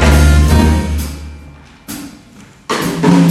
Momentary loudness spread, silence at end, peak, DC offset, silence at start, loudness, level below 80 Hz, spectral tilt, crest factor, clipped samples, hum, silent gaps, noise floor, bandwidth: 22 LU; 0 s; 0 dBFS; under 0.1%; 0 s; -12 LUFS; -16 dBFS; -6 dB/octave; 12 dB; under 0.1%; none; none; -39 dBFS; 14.5 kHz